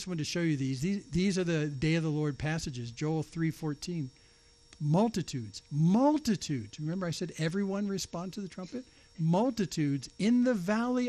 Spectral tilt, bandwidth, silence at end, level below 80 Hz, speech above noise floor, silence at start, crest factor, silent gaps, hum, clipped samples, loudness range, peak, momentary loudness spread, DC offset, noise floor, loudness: -6 dB/octave; 13 kHz; 0 s; -58 dBFS; 30 dB; 0 s; 16 dB; none; none; under 0.1%; 3 LU; -16 dBFS; 11 LU; under 0.1%; -61 dBFS; -32 LUFS